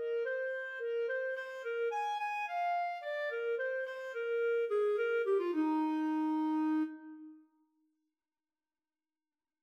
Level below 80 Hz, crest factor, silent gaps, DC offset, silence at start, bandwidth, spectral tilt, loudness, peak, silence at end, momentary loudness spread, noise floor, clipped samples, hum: under -90 dBFS; 12 dB; none; under 0.1%; 0 s; 8.4 kHz; -3.5 dB/octave; -35 LUFS; -24 dBFS; 2.25 s; 7 LU; under -90 dBFS; under 0.1%; none